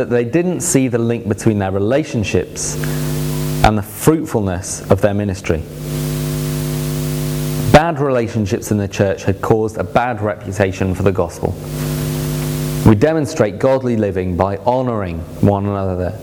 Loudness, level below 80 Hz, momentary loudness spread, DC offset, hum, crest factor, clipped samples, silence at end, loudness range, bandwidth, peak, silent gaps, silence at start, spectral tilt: -17 LUFS; -34 dBFS; 6 LU; under 0.1%; none; 16 dB; 0.2%; 0 s; 2 LU; over 20 kHz; 0 dBFS; none; 0 s; -6 dB/octave